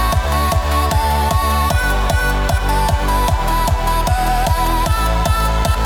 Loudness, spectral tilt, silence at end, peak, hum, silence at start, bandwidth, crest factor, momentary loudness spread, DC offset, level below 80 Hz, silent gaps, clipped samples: -16 LUFS; -4.5 dB/octave; 0 s; -4 dBFS; none; 0 s; 18 kHz; 12 dB; 1 LU; under 0.1%; -18 dBFS; none; under 0.1%